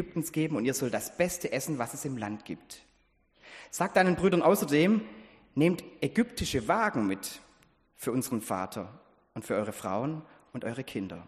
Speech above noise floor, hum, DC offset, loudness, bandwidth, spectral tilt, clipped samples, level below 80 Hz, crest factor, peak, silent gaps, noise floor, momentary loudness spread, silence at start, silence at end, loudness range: 38 dB; none; under 0.1%; -30 LUFS; 15 kHz; -5 dB/octave; under 0.1%; -58 dBFS; 20 dB; -10 dBFS; none; -68 dBFS; 18 LU; 0 s; 0.05 s; 8 LU